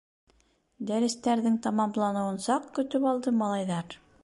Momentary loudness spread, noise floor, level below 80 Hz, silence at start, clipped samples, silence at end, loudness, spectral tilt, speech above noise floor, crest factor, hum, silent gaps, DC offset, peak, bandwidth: 6 LU; -67 dBFS; -70 dBFS; 0.8 s; under 0.1%; 0.3 s; -28 LUFS; -5.5 dB/octave; 39 dB; 14 dB; none; none; under 0.1%; -14 dBFS; 11.5 kHz